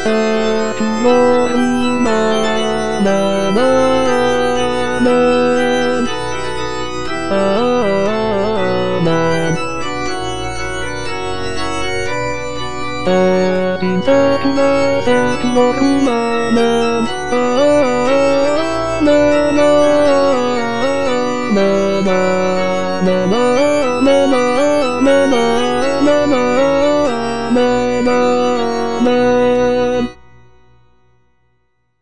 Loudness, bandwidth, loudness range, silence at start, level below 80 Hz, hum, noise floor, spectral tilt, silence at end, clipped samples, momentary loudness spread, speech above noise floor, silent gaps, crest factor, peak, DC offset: -14 LUFS; 10.5 kHz; 5 LU; 0 s; -40 dBFS; none; -64 dBFS; -5 dB/octave; 0 s; under 0.1%; 9 LU; 52 dB; none; 14 dB; 0 dBFS; 6%